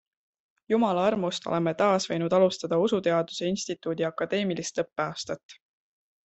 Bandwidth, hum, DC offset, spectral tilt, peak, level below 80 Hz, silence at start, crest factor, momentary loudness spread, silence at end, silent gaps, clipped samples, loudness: 8.4 kHz; none; under 0.1%; -5 dB/octave; -10 dBFS; -68 dBFS; 0.7 s; 18 dB; 8 LU; 0.7 s; 5.43-5.49 s; under 0.1%; -27 LUFS